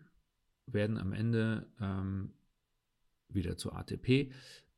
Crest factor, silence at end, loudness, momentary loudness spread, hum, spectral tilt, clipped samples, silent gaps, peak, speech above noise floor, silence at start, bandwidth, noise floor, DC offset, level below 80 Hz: 22 dB; 0.2 s; -36 LUFS; 10 LU; none; -7 dB/octave; under 0.1%; none; -14 dBFS; 46 dB; 0.7 s; 12.5 kHz; -81 dBFS; under 0.1%; -60 dBFS